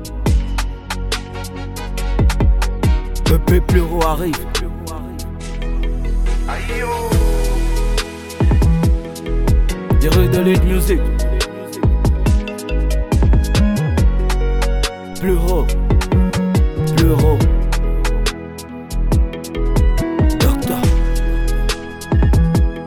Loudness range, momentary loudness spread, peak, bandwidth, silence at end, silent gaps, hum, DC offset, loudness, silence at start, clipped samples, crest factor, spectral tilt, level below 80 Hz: 4 LU; 10 LU; -2 dBFS; 17.5 kHz; 0 s; none; none; 0.2%; -18 LUFS; 0 s; under 0.1%; 14 dB; -6 dB/octave; -18 dBFS